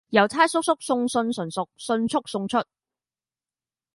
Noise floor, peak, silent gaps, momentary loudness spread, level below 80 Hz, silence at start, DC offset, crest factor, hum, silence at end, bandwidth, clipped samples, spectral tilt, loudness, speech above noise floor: under -90 dBFS; -2 dBFS; none; 9 LU; -66 dBFS; 0.1 s; under 0.1%; 22 dB; none; 1.35 s; 11.5 kHz; under 0.1%; -4 dB/octave; -24 LUFS; over 67 dB